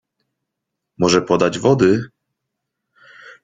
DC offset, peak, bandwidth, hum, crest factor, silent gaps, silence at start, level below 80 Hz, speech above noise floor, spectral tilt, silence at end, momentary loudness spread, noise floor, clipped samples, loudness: under 0.1%; 0 dBFS; 9.4 kHz; none; 20 dB; none; 1 s; -54 dBFS; 65 dB; -5.5 dB/octave; 0.15 s; 7 LU; -80 dBFS; under 0.1%; -16 LUFS